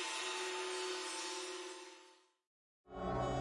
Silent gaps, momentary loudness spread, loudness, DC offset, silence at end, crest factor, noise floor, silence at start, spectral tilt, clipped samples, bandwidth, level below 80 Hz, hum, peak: 2.47-2.84 s; 14 LU; -42 LUFS; under 0.1%; 0 s; 16 dB; -65 dBFS; 0 s; -3 dB/octave; under 0.1%; 11.5 kHz; -60 dBFS; none; -28 dBFS